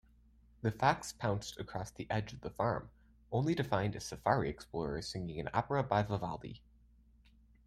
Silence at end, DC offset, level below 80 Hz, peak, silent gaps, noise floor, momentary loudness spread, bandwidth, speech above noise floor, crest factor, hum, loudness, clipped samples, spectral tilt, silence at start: 1.1 s; under 0.1%; -58 dBFS; -14 dBFS; none; -65 dBFS; 10 LU; 15.5 kHz; 29 dB; 24 dB; none; -37 LUFS; under 0.1%; -6 dB/octave; 0.65 s